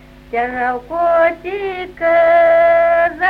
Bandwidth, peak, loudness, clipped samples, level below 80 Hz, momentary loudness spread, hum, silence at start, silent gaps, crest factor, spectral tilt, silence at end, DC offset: 5 kHz; -4 dBFS; -14 LUFS; under 0.1%; -44 dBFS; 12 LU; none; 0.3 s; none; 12 dB; -6 dB/octave; 0 s; under 0.1%